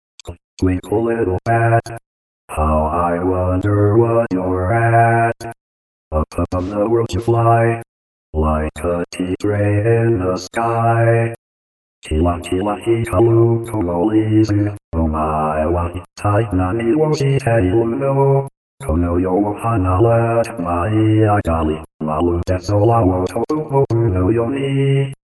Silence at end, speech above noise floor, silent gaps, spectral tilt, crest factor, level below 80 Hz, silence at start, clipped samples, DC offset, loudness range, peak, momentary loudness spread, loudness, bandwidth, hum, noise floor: 0.25 s; over 74 dB; 0.44-0.57 s, 2.06-2.48 s, 5.61-6.11 s, 7.88-8.33 s, 11.38-12.02 s, 14.84-14.92 s, 18.57-18.78 s, 21.94-21.99 s; -8 dB/octave; 14 dB; -32 dBFS; 0.25 s; under 0.1%; under 0.1%; 2 LU; -2 dBFS; 8 LU; -17 LUFS; 11 kHz; none; under -90 dBFS